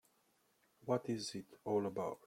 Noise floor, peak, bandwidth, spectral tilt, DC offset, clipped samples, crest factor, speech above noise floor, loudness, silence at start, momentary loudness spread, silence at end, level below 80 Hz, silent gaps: -77 dBFS; -22 dBFS; 16.5 kHz; -5.5 dB/octave; under 0.1%; under 0.1%; 20 dB; 37 dB; -41 LUFS; 0.85 s; 9 LU; 0.1 s; -80 dBFS; none